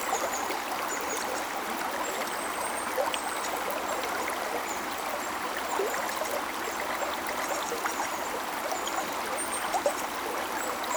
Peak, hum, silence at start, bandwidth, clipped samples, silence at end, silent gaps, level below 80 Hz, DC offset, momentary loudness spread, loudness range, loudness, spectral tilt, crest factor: -12 dBFS; none; 0 s; over 20 kHz; under 0.1%; 0 s; none; -62 dBFS; under 0.1%; 3 LU; 0 LU; -31 LUFS; -1 dB/octave; 20 dB